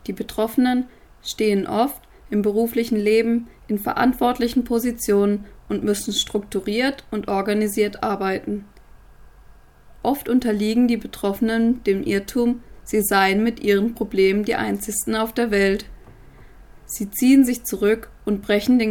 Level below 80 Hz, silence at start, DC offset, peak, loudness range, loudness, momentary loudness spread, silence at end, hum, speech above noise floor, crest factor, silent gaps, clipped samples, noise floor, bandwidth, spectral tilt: -46 dBFS; 0.05 s; under 0.1%; -6 dBFS; 4 LU; -21 LUFS; 9 LU; 0 s; none; 27 dB; 16 dB; none; under 0.1%; -47 dBFS; 19 kHz; -4.5 dB/octave